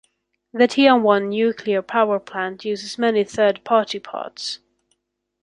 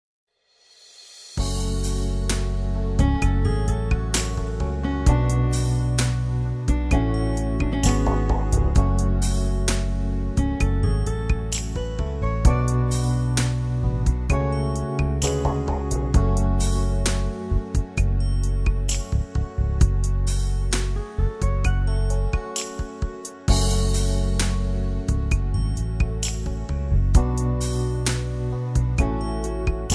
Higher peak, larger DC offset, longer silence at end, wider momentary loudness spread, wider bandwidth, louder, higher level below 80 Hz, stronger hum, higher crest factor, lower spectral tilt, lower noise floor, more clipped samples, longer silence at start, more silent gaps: about the same, -2 dBFS vs -4 dBFS; neither; first, 0.85 s vs 0 s; first, 14 LU vs 6 LU; about the same, 11 kHz vs 11 kHz; first, -20 LUFS vs -24 LUFS; second, -66 dBFS vs -24 dBFS; neither; about the same, 20 dB vs 18 dB; about the same, -4.5 dB/octave vs -5.5 dB/octave; first, -75 dBFS vs -59 dBFS; neither; second, 0.55 s vs 1 s; neither